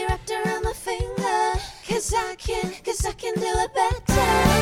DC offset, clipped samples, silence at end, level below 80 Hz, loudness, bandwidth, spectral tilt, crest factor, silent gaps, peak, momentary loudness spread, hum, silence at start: under 0.1%; under 0.1%; 0 s; -32 dBFS; -24 LUFS; 17 kHz; -4.5 dB/octave; 18 dB; none; -4 dBFS; 8 LU; none; 0 s